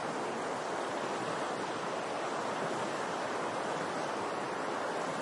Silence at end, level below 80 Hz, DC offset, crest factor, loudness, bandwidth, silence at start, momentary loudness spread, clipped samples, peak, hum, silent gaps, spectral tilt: 0 s; -82 dBFS; under 0.1%; 14 dB; -36 LUFS; 11.5 kHz; 0 s; 1 LU; under 0.1%; -22 dBFS; none; none; -3.5 dB/octave